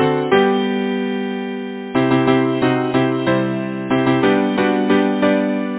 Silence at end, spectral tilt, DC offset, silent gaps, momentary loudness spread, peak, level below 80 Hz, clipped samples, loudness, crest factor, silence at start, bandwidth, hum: 0 s; -10.5 dB/octave; under 0.1%; none; 7 LU; 0 dBFS; -54 dBFS; under 0.1%; -17 LUFS; 16 dB; 0 s; 4 kHz; none